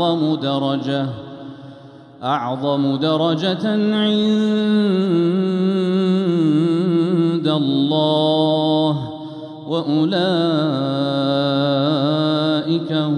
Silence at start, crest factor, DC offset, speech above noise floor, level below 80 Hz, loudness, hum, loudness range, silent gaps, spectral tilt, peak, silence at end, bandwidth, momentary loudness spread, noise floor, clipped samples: 0 s; 12 dB; under 0.1%; 23 dB; -66 dBFS; -18 LUFS; none; 4 LU; none; -7.5 dB/octave; -6 dBFS; 0 s; 9.8 kHz; 8 LU; -40 dBFS; under 0.1%